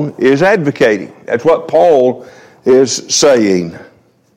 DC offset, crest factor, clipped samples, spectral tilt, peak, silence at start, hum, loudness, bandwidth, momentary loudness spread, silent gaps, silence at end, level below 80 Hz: under 0.1%; 12 dB; under 0.1%; -4 dB/octave; 0 dBFS; 0 s; none; -11 LUFS; 14 kHz; 10 LU; none; 0.5 s; -54 dBFS